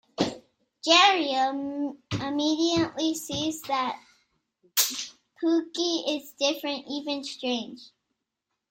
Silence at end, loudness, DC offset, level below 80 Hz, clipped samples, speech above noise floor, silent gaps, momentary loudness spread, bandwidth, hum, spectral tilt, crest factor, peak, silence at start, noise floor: 0.85 s; -26 LUFS; under 0.1%; -64 dBFS; under 0.1%; 57 dB; none; 12 LU; 16 kHz; none; -2.5 dB/octave; 20 dB; -6 dBFS; 0.2 s; -83 dBFS